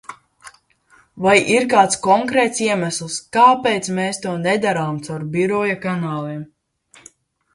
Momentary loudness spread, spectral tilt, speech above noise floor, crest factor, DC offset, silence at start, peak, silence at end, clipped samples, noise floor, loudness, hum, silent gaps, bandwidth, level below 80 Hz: 11 LU; -4 dB/octave; 37 dB; 18 dB; under 0.1%; 0.1 s; 0 dBFS; 1.1 s; under 0.1%; -55 dBFS; -17 LUFS; none; none; 11.5 kHz; -60 dBFS